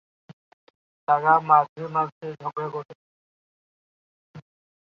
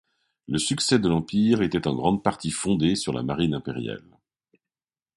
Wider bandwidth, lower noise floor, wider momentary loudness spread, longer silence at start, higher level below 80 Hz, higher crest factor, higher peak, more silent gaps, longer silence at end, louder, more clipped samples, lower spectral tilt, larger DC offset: second, 6.2 kHz vs 11.5 kHz; about the same, under -90 dBFS vs under -90 dBFS; first, 18 LU vs 9 LU; second, 0.3 s vs 0.5 s; second, -78 dBFS vs -50 dBFS; about the same, 22 dB vs 22 dB; about the same, -4 dBFS vs -4 dBFS; first, 0.33-1.07 s, 1.69-1.76 s, 2.12-2.21 s, 2.85-2.89 s, 2.95-4.34 s vs none; second, 0.55 s vs 1.2 s; about the same, -23 LUFS vs -24 LUFS; neither; first, -8 dB/octave vs -5 dB/octave; neither